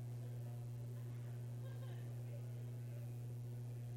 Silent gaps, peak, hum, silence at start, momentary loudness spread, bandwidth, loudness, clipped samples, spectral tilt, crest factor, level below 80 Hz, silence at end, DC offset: none; -40 dBFS; 60 Hz at -50 dBFS; 0 s; 0 LU; 16 kHz; -49 LUFS; under 0.1%; -7.5 dB/octave; 8 dB; -72 dBFS; 0 s; under 0.1%